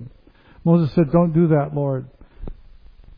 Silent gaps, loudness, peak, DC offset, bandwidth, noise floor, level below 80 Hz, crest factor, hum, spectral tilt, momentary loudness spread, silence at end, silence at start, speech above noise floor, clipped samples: none; -19 LUFS; -2 dBFS; under 0.1%; 4.9 kHz; -49 dBFS; -42 dBFS; 18 dB; none; -12.5 dB/octave; 24 LU; 0.65 s; 0 s; 32 dB; under 0.1%